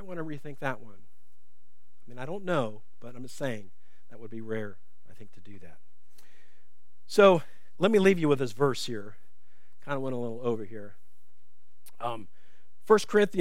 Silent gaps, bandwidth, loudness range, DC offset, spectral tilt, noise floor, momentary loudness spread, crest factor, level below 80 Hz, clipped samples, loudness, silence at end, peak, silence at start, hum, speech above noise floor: none; 15.5 kHz; 15 LU; 2%; -6 dB/octave; -74 dBFS; 22 LU; 24 dB; -76 dBFS; under 0.1%; -28 LUFS; 0 s; -6 dBFS; 0 s; none; 46 dB